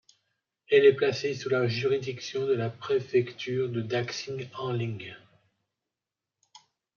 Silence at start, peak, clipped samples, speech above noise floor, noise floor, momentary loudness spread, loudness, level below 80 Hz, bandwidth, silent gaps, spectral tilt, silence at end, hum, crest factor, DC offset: 0.7 s; -10 dBFS; under 0.1%; 62 dB; -89 dBFS; 14 LU; -28 LUFS; -74 dBFS; 7 kHz; none; -6 dB/octave; 1.8 s; none; 20 dB; under 0.1%